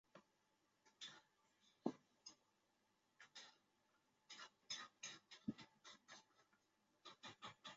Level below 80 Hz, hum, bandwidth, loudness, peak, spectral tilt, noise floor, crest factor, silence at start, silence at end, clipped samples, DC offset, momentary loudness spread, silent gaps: under -90 dBFS; none; 7.6 kHz; -57 LUFS; -28 dBFS; -2.5 dB/octave; -84 dBFS; 32 dB; 0.15 s; 0 s; under 0.1%; under 0.1%; 13 LU; none